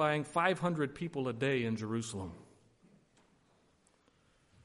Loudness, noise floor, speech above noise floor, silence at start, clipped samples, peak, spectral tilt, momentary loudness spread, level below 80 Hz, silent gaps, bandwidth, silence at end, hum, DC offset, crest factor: -35 LUFS; -70 dBFS; 36 dB; 0 s; under 0.1%; -14 dBFS; -5.5 dB/octave; 12 LU; -70 dBFS; none; 11.5 kHz; 2.2 s; none; under 0.1%; 22 dB